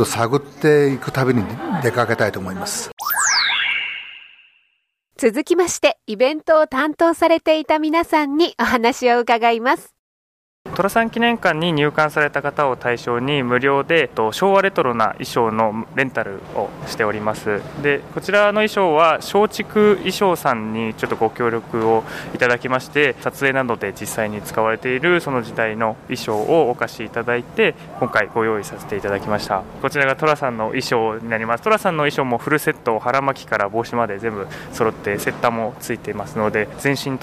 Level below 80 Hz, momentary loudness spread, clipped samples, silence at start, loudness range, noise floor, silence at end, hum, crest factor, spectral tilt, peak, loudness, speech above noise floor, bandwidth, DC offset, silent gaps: -52 dBFS; 9 LU; under 0.1%; 0 s; 4 LU; -68 dBFS; 0 s; none; 16 dB; -4.5 dB/octave; -2 dBFS; -19 LUFS; 49 dB; 15.5 kHz; under 0.1%; 2.93-2.97 s, 9.99-10.65 s